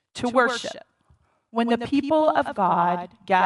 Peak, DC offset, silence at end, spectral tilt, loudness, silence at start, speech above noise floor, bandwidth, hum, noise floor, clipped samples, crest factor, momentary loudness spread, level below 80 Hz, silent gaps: -4 dBFS; under 0.1%; 0 s; -5 dB/octave; -23 LUFS; 0.15 s; 40 dB; 11.5 kHz; none; -62 dBFS; under 0.1%; 18 dB; 10 LU; -62 dBFS; none